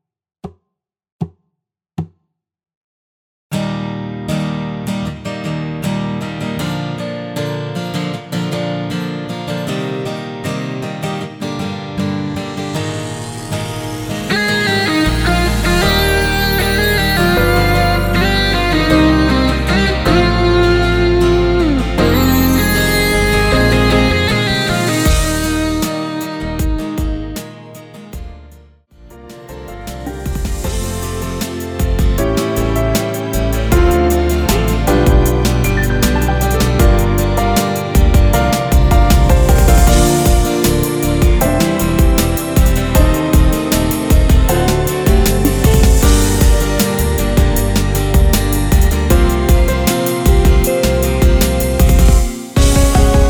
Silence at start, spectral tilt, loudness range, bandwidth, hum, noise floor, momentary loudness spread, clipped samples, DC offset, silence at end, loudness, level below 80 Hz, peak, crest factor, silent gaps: 0.45 s; -5 dB/octave; 11 LU; over 20 kHz; none; -77 dBFS; 11 LU; under 0.1%; under 0.1%; 0 s; -14 LUFS; -16 dBFS; 0 dBFS; 14 dB; 1.12-1.19 s, 2.77-3.50 s